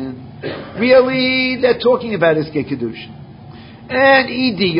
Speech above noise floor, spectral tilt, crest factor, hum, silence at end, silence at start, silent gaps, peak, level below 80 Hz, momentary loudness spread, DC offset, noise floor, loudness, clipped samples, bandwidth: 22 dB; -10 dB/octave; 16 dB; none; 0 s; 0 s; none; 0 dBFS; -48 dBFS; 17 LU; under 0.1%; -36 dBFS; -14 LUFS; under 0.1%; 5.4 kHz